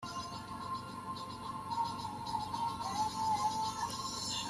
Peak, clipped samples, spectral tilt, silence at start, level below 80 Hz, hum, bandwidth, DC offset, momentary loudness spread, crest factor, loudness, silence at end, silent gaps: -24 dBFS; under 0.1%; -3 dB/octave; 0 s; -64 dBFS; none; 14 kHz; under 0.1%; 9 LU; 14 dB; -38 LUFS; 0 s; none